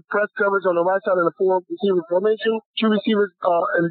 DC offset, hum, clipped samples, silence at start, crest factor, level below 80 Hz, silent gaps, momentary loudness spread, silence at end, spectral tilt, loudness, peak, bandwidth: under 0.1%; none; under 0.1%; 0.1 s; 14 dB; -74 dBFS; 2.66-2.74 s; 3 LU; 0 s; -10.5 dB/octave; -20 LUFS; -6 dBFS; 4.6 kHz